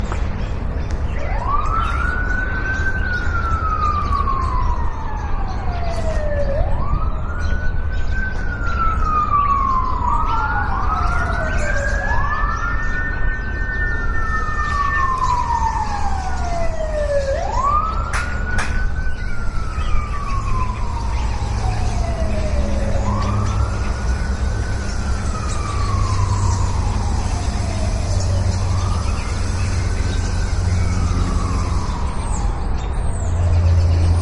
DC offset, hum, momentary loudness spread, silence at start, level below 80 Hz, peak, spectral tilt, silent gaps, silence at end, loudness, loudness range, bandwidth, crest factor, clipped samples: under 0.1%; none; 6 LU; 0 s; -22 dBFS; -4 dBFS; -5.5 dB/octave; none; 0 s; -21 LUFS; 4 LU; 11 kHz; 14 dB; under 0.1%